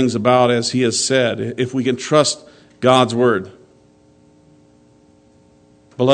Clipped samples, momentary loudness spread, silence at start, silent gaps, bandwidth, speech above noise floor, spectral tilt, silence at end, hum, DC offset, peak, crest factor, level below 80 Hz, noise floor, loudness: under 0.1%; 9 LU; 0 s; none; 9.4 kHz; 35 dB; -4.5 dB/octave; 0 s; none; under 0.1%; 0 dBFS; 18 dB; -62 dBFS; -51 dBFS; -16 LUFS